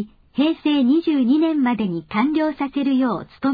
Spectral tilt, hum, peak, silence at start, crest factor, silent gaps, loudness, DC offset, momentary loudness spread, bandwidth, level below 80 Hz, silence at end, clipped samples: -8.5 dB/octave; none; -6 dBFS; 0 s; 12 dB; none; -20 LUFS; under 0.1%; 6 LU; 5 kHz; -56 dBFS; 0 s; under 0.1%